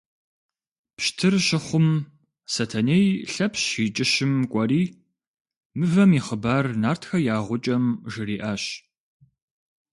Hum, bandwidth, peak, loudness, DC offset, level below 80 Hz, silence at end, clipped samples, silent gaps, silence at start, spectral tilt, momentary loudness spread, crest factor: none; 11.5 kHz; -8 dBFS; -23 LUFS; under 0.1%; -58 dBFS; 1.15 s; under 0.1%; 5.27-5.34 s, 5.40-5.45 s, 5.57-5.70 s; 1 s; -5 dB/octave; 10 LU; 16 dB